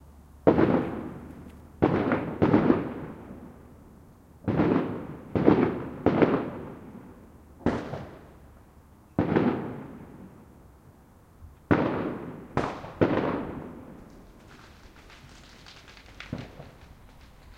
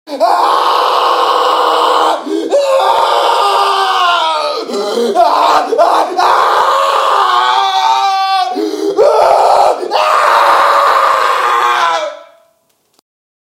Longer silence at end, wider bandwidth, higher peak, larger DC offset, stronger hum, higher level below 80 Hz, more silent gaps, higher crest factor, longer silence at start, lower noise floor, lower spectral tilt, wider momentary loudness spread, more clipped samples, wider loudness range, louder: second, 0.05 s vs 1.2 s; second, 10 kHz vs 16.5 kHz; second, -4 dBFS vs 0 dBFS; neither; neither; first, -52 dBFS vs -60 dBFS; neither; first, 26 dB vs 10 dB; about the same, 0.05 s vs 0.05 s; about the same, -54 dBFS vs -57 dBFS; first, -8.5 dB/octave vs -1 dB/octave; first, 25 LU vs 6 LU; second, under 0.1% vs 0.1%; first, 8 LU vs 2 LU; second, -27 LUFS vs -10 LUFS